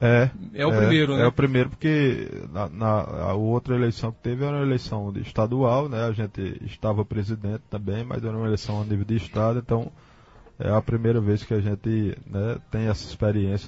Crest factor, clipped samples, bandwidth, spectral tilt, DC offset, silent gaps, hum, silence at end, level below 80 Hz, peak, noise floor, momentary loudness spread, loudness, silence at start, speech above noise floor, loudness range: 18 dB; under 0.1%; 7.8 kHz; -8 dB/octave; under 0.1%; none; none; 0 s; -46 dBFS; -6 dBFS; -51 dBFS; 10 LU; -25 LUFS; 0 s; 27 dB; 5 LU